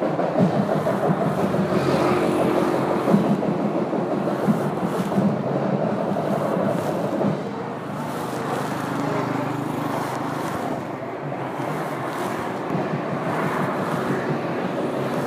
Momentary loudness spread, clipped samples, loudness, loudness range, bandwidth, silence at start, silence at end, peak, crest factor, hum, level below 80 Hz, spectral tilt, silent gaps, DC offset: 7 LU; under 0.1%; -23 LUFS; 6 LU; 15.5 kHz; 0 s; 0 s; -2 dBFS; 20 dB; none; -62 dBFS; -7 dB/octave; none; under 0.1%